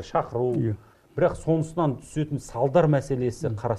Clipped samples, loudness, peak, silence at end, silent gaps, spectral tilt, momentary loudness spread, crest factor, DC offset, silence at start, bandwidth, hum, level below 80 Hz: under 0.1%; -25 LUFS; -6 dBFS; 0 s; none; -8 dB/octave; 9 LU; 18 dB; under 0.1%; 0 s; 12 kHz; none; -50 dBFS